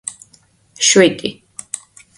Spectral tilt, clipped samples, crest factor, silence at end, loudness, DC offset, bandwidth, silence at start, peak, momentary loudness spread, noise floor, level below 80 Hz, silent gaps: -2.5 dB/octave; under 0.1%; 18 dB; 0.4 s; -13 LUFS; under 0.1%; 11.5 kHz; 0.05 s; 0 dBFS; 19 LU; -53 dBFS; -60 dBFS; none